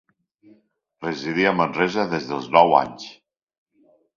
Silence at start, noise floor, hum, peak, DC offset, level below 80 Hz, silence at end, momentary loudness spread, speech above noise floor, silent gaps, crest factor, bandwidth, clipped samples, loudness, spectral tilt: 1 s; -60 dBFS; none; 0 dBFS; under 0.1%; -62 dBFS; 1.05 s; 17 LU; 40 dB; none; 22 dB; 7.4 kHz; under 0.1%; -20 LUFS; -5.5 dB/octave